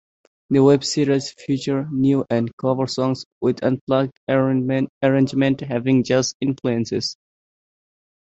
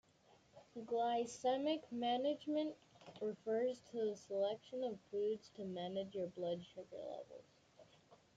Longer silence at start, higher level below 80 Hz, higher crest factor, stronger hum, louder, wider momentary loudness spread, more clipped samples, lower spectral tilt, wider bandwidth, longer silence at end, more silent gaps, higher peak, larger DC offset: about the same, 0.5 s vs 0.55 s; first, -58 dBFS vs -84 dBFS; about the same, 18 dB vs 16 dB; neither; first, -20 LUFS vs -42 LUFS; second, 6 LU vs 14 LU; neither; about the same, -6 dB/octave vs -5 dB/octave; about the same, 8.2 kHz vs 9 kHz; first, 1.15 s vs 0.2 s; first, 2.53-2.58 s, 3.26-3.41 s, 3.81-3.87 s, 4.17-4.27 s, 4.89-5.01 s, 6.34-6.40 s vs none; first, -2 dBFS vs -26 dBFS; neither